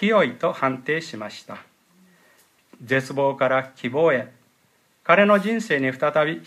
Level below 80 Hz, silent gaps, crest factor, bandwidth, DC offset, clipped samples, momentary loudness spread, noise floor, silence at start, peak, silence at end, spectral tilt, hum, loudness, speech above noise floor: -72 dBFS; none; 20 dB; 14 kHz; under 0.1%; under 0.1%; 17 LU; -63 dBFS; 0 s; -2 dBFS; 0.05 s; -6 dB/octave; none; -21 LUFS; 41 dB